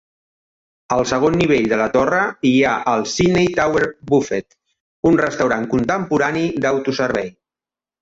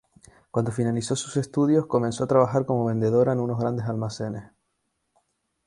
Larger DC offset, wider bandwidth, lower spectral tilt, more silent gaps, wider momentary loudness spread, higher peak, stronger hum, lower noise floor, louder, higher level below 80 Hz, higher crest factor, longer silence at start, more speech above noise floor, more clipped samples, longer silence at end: neither; second, 8 kHz vs 11.5 kHz; second, -5.5 dB/octave vs -7 dB/octave; first, 4.80-5.03 s vs none; second, 5 LU vs 9 LU; about the same, -4 dBFS vs -6 dBFS; neither; first, under -90 dBFS vs -76 dBFS; first, -17 LUFS vs -24 LUFS; first, -46 dBFS vs -60 dBFS; about the same, 16 dB vs 20 dB; first, 0.9 s vs 0.55 s; first, over 73 dB vs 52 dB; neither; second, 0.7 s vs 1.2 s